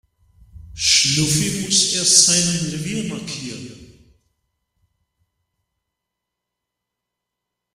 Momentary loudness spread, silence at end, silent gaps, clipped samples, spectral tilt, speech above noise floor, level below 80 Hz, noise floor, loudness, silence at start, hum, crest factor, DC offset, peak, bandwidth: 17 LU; 3.9 s; none; under 0.1%; -2 dB/octave; 63 dB; -50 dBFS; -82 dBFS; -15 LUFS; 0.55 s; 60 Hz at -65 dBFS; 22 dB; under 0.1%; 0 dBFS; 15.5 kHz